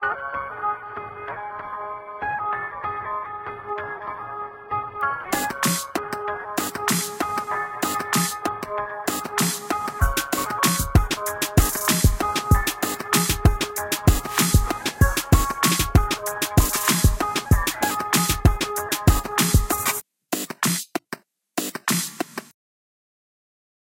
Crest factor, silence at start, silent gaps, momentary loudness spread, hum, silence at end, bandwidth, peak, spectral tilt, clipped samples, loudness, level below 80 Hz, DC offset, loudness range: 22 dB; 0 s; none; 13 LU; none; 1.4 s; 17 kHz; -2 dBFS; -4 dB/octave; under 0.1%; -23 LUFS; -30 dBFS; under 0.1%; 9 LU